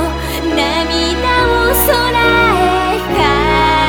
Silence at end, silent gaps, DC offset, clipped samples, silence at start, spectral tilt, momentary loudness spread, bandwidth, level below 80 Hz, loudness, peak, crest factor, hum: 0 s; none; under 0.1%; under 0.1%; 0 s; -4 dB/octave; 5 LU; over 20 kHz; -24 dBFS; -12 LUFS; 0 dBFS; 12 dB; none